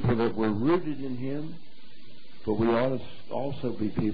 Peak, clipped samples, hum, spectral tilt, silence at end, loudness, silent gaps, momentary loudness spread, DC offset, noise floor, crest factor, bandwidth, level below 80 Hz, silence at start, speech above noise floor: -14 dBFS; under 0.1%; none; -10.5 dB/octave; 0 s; -29 LUFS; none; 12 LU; 3%; -54 dBFS; 14 dB; 5 kHz; -52 dBFS; 0 s; 26 dB